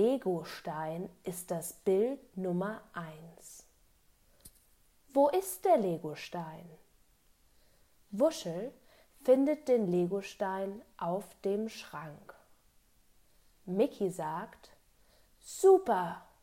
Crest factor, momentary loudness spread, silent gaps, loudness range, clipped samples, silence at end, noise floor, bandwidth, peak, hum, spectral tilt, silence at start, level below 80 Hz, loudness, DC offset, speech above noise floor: 20 dB; 19 LU; none; 7 LU; under 0.1%; 0.2 s; -67 dBFS; 16 kHz; -14 dBFS; none; -6 dB/octave; 0 s; -70 dBFS; -32 LUFS; under 0.1%; 35 dB